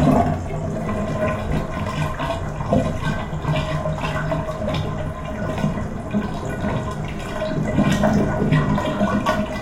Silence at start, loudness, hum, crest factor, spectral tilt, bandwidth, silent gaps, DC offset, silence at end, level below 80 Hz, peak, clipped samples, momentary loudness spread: 0 s; -23 LUFS; none; 18 dB; -7 dB/octave; 15 kHz; none; under 0.1%; 0 s; -34 dBFS; -4 dBFS; under 0.1%; 8 LU